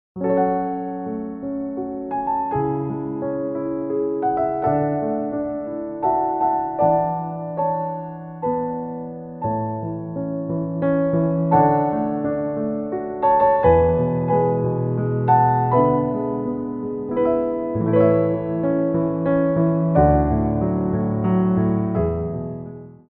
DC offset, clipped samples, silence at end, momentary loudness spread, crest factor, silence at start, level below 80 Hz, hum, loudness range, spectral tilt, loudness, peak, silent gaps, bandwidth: under 0.1%; under 0.1%; 0.15 s; 11 LU; 18 dB; 0.15 s; -40 dBFS; none; 6 LU; -10 dB/octave; -21 LUFS; -2 dBFS; none; 3.8 kHz